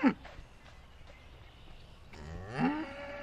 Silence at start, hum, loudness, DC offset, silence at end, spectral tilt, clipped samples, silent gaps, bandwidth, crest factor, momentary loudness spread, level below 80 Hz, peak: 0 s; none; -36 LUFS; under 0.1%; 0 s; -7 dB/octave; under 0.1%; none; 10 kHz; 24 dB; 22 LU; -54 dBFS; -14 dBFS